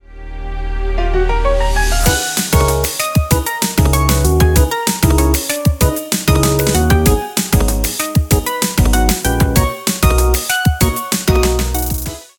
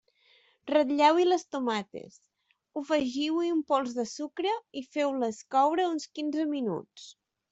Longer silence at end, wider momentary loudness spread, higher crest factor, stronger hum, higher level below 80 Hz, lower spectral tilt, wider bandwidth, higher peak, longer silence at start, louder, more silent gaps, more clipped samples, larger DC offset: second, 0.15 s vs 0.4 s; second, 5 LU vs 16 LU; about the same, 14 dB vs 18 dB; neither; first, -18 dBFS vs -74 dBFS; about the same, -4.5 dB/octave vs -4 dB/octave; first, 19 kHz vs 8.2 kHz; first, 0 dBFS vs -12 dBFS; second, 0.1 s vs 0.65 s; first, -14 LUFS vs -29 LUFS; neither; neither; neither